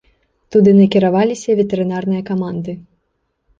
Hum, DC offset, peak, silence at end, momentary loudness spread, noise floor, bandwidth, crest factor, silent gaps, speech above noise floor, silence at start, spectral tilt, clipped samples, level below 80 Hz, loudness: none; under 0.1%; -2 dBFS; 0.8 s; 14 LU; -68 dBFS; 7.6 kHz; 14 dB; none; 54 dB; 0.5 s; -7.5 dB/octave; under 0.1%; -54 dBFS; -15 LUFS